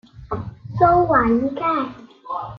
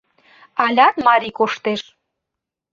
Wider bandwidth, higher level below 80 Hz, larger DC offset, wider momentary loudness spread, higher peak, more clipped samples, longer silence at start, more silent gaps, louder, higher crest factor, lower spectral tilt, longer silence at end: second, 6 kHz vs 7.6 kHz; first, -42 dBFS vs -64 dBFS; neither; first, 15 LU vs 12 LU; about the same, -2 dBFS vs 0 dBFS; neither; second, 0.15 s vs 0.55 s; neither; about the same, -18 LUFS vs -17 LUFS; about the same, 18 dB vs 18 dB; first, -9.5 dB/octave vs -4.5 dB/octave; second, 0 s vs 0.9 s